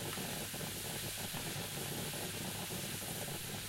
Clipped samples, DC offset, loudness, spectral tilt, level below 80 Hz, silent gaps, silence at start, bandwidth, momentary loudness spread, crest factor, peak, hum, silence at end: under 0.1%; under 0.1%; -40 LUFS; -3 dB/octave; -62 dBFS; none; 0 s; 16 kHz; 1 LU; 16 dB; -26 dBFS; none; 0 s